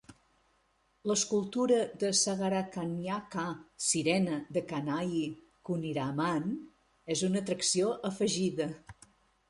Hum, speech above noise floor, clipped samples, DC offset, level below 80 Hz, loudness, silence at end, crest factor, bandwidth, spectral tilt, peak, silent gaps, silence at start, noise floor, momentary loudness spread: none; 41 dB; under 0.1%; under 0.1%; -68 dBFS; -32 LUFS; 0.55 s; 18 dB; 11.5 kHz; -4 dB/octave; -16 dBFS; none; 0.1 s; -72 dBFS; 10 LU